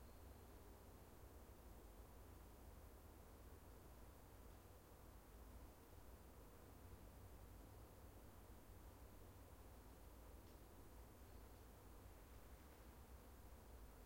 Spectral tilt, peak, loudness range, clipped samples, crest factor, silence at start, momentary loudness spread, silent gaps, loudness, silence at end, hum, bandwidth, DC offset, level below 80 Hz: -5.5 dB/octave; -50 dBFS; 1 LU; under 0.1%; 12 dB; 0 s; 1 LU; none; -64 LUFS; 0 s; none; 16.5 kHz; under 0.1%; -66 dBFS